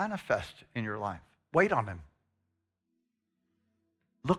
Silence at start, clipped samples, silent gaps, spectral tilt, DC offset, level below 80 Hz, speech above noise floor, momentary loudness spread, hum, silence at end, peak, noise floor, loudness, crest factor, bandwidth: 0 s; under 0.1%; none; -6.5 dB/octave; under 0.1%; -62 dBFS; 50 dB; 14 LU; none; 0 s; -12 dBFS; -82 dBFS; -32 LUFS; 24 dB; 13 kHz